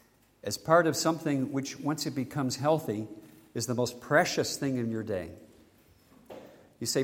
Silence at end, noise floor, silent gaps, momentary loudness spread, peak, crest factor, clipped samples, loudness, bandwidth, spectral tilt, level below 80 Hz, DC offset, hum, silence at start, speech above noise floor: 0 s; -61 dBFS; none; 19 LU; -8 dBFS; 22 dB; under 0.1%; -30 LUFS; 16.5 kHz; -4.5 dB/octave; -68 dBFS; under 0.1%; none; 0.45 s; 32 dB